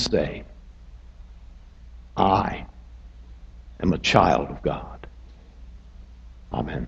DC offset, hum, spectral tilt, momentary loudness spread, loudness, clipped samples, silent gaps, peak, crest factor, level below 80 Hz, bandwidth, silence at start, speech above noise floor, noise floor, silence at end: under 0.1%; none; -5.5 dB/octave; 28 LU; -24 LUFS; under 0.1%; none; 0 dBFS; 26 dB; -40 dBFS; 8.4 kHz; 0 s; 23 dB; -45 dBFS; 0 s